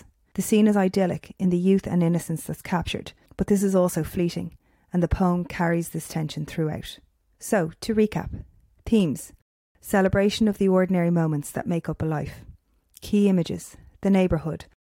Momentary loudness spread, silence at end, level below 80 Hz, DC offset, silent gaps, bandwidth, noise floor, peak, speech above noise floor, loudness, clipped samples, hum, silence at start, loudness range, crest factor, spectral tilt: 15 LU; 0.25 s; -44 dBFS; under 0.1%; 9.42-9.75 s; 17 kHz; -55 dBFS; -10 dBFS; 32 dB; -24 LUFS; under 0.1%; none; 0.35 s; 4 LU; 14 dB; -6.5 dB/octave